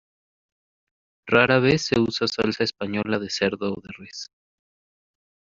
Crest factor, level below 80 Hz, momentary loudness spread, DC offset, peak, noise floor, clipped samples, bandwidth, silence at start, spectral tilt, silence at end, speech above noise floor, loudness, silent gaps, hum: 22 dB; -56 dBFS; 19 LU; under 0.1%; -2 dBFS; under -90 dBFS; under 0.1%; 7.8 kHz; 1.25 s; -3.5 dB/octave; 1.3 s; over 67 dB; -22 LUFS; none; none